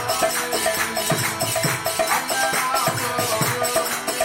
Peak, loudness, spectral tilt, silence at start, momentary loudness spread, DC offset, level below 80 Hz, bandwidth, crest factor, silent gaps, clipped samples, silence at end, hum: -6 dBFS; -21 LUFS; -2.5 dB/octave; 0 s; 2 LU; under 0.1%; -54 dBFS; 17 kHz; 16 dB; none; under 0.1%; 0 s; none